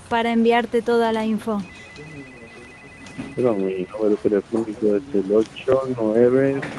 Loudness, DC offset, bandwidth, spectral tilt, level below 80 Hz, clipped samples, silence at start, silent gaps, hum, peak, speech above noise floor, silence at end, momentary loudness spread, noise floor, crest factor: -21 LUFS; under 0.1%; 12 kHz; -6.5 dB/octave; -54 dBFS; under 0.1%; 0 s; none; none; -4 dBFS; 21 dB; 0 s; 21 LU; -42 dBFS; 16 dB